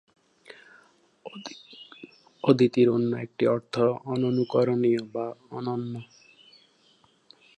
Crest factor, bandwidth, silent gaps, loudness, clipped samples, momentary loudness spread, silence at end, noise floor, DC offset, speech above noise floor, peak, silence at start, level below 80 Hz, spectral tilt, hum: 22 dB; 8.8 kHz; none; -25 LUFS; under 0.1%; 23 LU; 1.55 s; -63 dBFS; under 0.1%; 38 dB; -6 dBFS; 0.5 s; -72 dBFS; -7.5 dB/octave; none